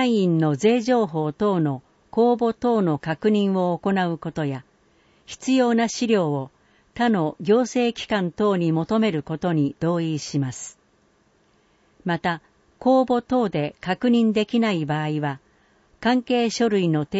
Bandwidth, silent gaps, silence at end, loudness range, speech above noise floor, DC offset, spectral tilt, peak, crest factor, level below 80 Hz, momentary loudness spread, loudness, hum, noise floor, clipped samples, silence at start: 8 kHz; none; 0 s; 4 LU; 40 dB; under 0.1%; -6 dB/octave; -8 dBFS; 14 dB; -60 dBFS; 10 LU; -22 LUFS; none; -62 dBFS; under 0.1%; 0 s